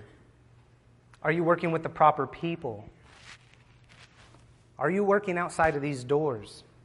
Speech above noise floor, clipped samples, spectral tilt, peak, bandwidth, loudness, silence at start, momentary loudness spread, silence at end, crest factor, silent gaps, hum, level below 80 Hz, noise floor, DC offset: 32 dB; under 0.1%; -6.5 dB/octave; -8 dBFS; 11.5 kHz; -28 LUFS; 0 s; 21 LU; 0.25 s; 22 dB; none; none; -60 dBFS; -59 dBFS; under 0.1%